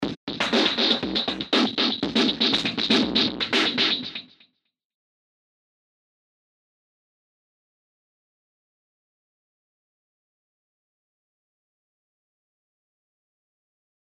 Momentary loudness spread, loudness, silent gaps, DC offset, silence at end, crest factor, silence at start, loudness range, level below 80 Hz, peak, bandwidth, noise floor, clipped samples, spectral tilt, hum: 7 LU; -22 LUFS; 0.17-0.27 s; under 0.1%; 9.8 s; 24 dB; 0 s; 8 LU; -60 dBFS; -6 dBFS; 11.5 kHz; -62 dBFS; under 0.1%; -3.5 dB/octave; none